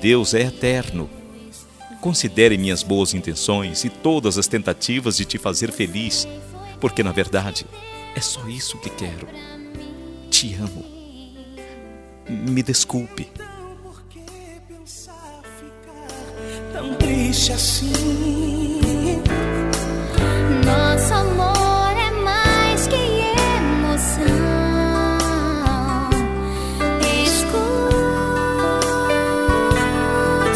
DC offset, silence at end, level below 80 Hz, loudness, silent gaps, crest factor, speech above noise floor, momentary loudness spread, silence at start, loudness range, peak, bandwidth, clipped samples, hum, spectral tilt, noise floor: under 0.1%; 0 s; -30 dBFS; -19 LUFS; none; 20 dB; 20 dB; 22 LU; 0 s; 8 LU; 0 dBFS; 11 kHz; under 0.1%; none; -4 dB/octave; -40 dBFS